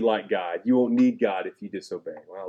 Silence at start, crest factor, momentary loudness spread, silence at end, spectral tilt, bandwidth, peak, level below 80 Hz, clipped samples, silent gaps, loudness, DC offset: 0 s; 16 dB; 15 LU; 0 s; -6.5 dB/octave; 8.2 kHz; -10 dBFS; -78 dBFS; under 0.1%; none; -24 LUFS; under 0.1%